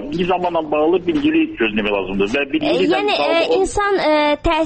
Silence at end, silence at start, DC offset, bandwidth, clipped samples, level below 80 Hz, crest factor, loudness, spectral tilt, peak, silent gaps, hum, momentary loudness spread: 0 s; 0 s; under 0.1%; 8.8 kHz; under 0.1%; -36 dBFS; 10 dB; -17 LUFS; -5 dB/octave; -6 dBFS; none; none; 4 LU